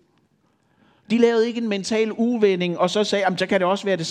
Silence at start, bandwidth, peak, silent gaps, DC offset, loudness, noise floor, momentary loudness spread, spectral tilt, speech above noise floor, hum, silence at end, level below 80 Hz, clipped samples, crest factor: 1.1 s; 10.5 kHz; -4 dBFS; none; under 0.1%; -21 LUFS; -64 dBFS; 4 LU; -5 dB/octave; 44 dB; none; 0 s; -70 dBFS; under 0.1%; 16 dB